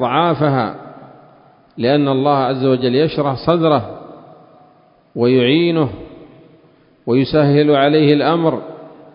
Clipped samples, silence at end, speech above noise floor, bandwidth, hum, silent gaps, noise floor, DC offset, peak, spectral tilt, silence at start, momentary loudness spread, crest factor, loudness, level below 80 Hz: under 0.1%; 0.25 s; 37 dB; 5.4 kHz; none; none; -51 dBFS; under 0.1%; 0 dBFS; -10.5 dB/octave; 0 s; 19 LU; 16 dB; -15 LUFS; -50 dBFS